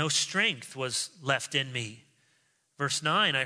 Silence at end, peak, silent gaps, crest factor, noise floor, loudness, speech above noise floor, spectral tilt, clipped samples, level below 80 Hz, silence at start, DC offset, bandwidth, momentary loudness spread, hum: 0 s; -12 dBFS; none; 20 dB; -70 dBFS; -28 LUFS; 41 dB; -2 dB/octave; under 0.1%; -78 dBFS; 0 s; under 0.1%; 11 kHz; 10 LU; none